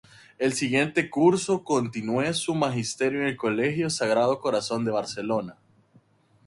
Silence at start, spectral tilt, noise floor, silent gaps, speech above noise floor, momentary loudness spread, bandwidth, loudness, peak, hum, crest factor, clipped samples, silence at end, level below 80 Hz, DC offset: 0.4 s; -4.5 dB/octave; -60 dBFS; none; 36 dB; 7 LU; 11.5 kHz; -25 LUFS; -8 dBFS; none; 18 dB; under 0.1%; 0.95 s; -64 dBFS; under 0.1%